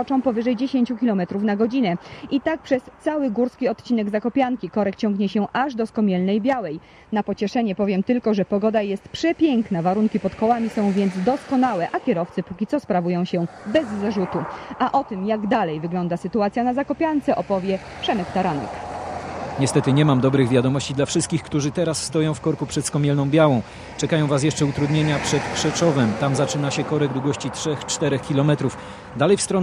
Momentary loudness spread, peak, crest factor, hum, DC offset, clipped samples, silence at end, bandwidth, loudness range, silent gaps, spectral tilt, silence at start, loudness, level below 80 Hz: 7 LU; -2 dBFS; 18 dB; none; under 0.1%; under 0.1%; 0 s; 14 kHz; 3 LU; none; -6 dB/octave; 0 s; -22 LUFS; -50 dBFS